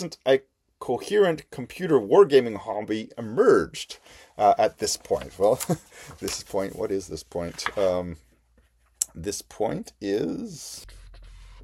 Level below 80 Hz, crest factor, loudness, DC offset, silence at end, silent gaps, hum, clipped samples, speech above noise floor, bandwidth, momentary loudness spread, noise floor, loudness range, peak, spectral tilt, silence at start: -54 dBFS; 24 dB; -25 LUFS; under 0.1%; 0 s; none; none; under 0.1%; 38 dB; 16 kHz; 18 LU; -62 dBFS; 8 LU; 0 dBFS; -4.5 dB/octave; 0 s